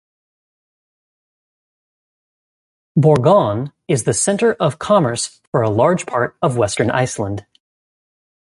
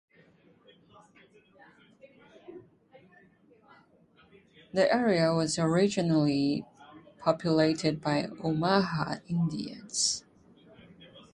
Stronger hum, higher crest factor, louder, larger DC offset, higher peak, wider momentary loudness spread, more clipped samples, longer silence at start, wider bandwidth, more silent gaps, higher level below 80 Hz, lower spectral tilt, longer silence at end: neither; about the same, 18 dB vs 22 dB; first, -17 LUFS vs -28 LUFS; neither; first, -2 dBFS vs -10 dBFS; about the same, 9 LU vs 10 LU; neither; first, 2.95 s vs 2.05 s; about the same, 11.5 kHz vs 11 kHz; first, 5.47-5.52 s vs none; first, -50 dBFS vs -66 dBFS; about the same, -5.5 dB/octave vs -5 dB/octave; first, 1.05 s vs 0.15 s